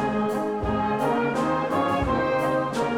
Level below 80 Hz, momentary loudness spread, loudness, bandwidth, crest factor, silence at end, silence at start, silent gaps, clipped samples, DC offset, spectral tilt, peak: -42 dBFS; 2 LU; -24 LUFS; 18 kHz; 12 dB; 0 s; 0 s; none; under 0.1%; under 0.1%; -6.5 dB/octave; -12 dBFS